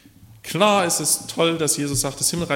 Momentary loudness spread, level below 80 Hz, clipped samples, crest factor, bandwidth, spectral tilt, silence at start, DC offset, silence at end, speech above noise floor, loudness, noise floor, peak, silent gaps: 5 LU; -50 dBFS; under 0.1%; 20 dB; 16.5 kHz; -3 dB/octave; 0.45 s; under 0.1%; 0 s; 21 dB; -20 LUFS; -42 dBFS; -2 dBFS; none